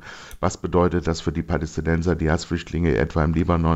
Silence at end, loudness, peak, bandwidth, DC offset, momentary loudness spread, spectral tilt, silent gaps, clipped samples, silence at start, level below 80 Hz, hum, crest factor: 0 s; -23 LUFS; -6 dBFS; 8.2 kHz; under 0.1%; 6 LU; -7 dB/octave; none; under 0.1%; 0 s; -36 dBFS; none; 16 dB